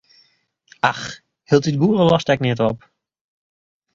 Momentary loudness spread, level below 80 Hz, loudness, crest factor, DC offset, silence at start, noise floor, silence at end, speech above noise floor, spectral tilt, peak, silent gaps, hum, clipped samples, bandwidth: 16 LU; -54 dBFS; -18 LUFS; 20 dB; under 0.1%; 0.85 s; -61 dBFS; 1.15 s; 44 dB; -6.5 dB/octave; 0 dBFS; none; none; under 0.1%; 7.6 kHz